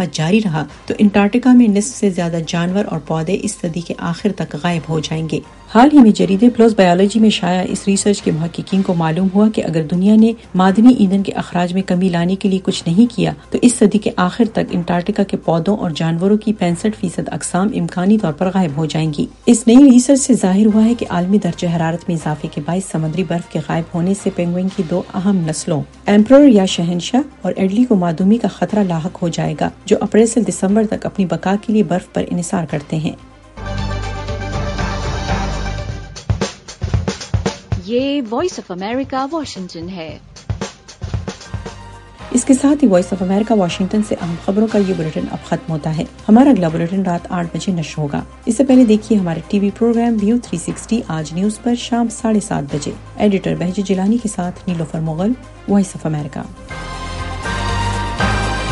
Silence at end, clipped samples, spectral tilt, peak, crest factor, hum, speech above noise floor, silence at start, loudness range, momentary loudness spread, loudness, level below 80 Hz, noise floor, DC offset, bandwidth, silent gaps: 0 s; under 0.1%; -6 dB/octave; 0 dBFS; 16 dB; none; 21 dB; 0 s; 9 LU; 13 LU; -16 LUFS; -34 dBFS; -35 dBFS; under 0.1%; 11.5 kHz; none